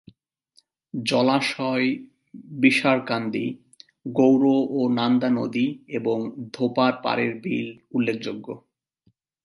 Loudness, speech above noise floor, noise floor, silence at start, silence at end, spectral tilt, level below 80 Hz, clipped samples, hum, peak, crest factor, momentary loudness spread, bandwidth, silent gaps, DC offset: -23 LUFS; 44 dB; -67 dBFS; 0.95 s; 0.85 s; -6 dB/octave; -72 dBFS; under 0.1%; none; -4 dBFS; 20 dB; 14 LU; 11.5 kHz; none; under 0.1%